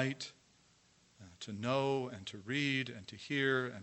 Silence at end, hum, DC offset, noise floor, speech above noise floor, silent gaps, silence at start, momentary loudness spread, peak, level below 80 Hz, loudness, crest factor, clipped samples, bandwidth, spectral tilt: 0 s; none; under 0.1%; -69 dBFS; 32 dB; none; 0 s; 14 LU; -18 dBFS; -78 dBFS; -37 LUFS; 20 dB; under 0.1%; 8.4 kHz; -5 dB/octave